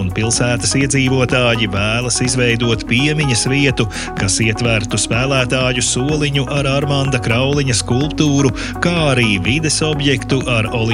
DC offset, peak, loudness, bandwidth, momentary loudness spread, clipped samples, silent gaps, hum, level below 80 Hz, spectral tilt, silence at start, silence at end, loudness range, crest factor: under 0.1%; 0 dBFS; -15 LUFS; 13 kHz; 3 LU; under 0.1%; none; none; -32 dBFS; -4 dB/octave; 0 s; 0 s; 1 LU; 14 dB